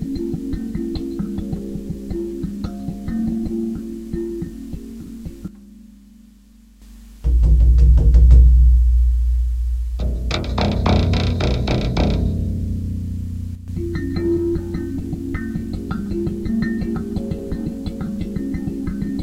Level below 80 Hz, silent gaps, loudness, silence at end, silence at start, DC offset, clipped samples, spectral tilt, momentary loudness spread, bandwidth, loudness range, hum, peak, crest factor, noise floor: -20 dBFS; none; -21 LUFS; 0 s; 0 s; under 0.1%; under 0.1%; -8 dB/octave; 15 LU; 7.4 kHz; 12 LU; none; 0 dBFS; 18 dB; -47 dBFS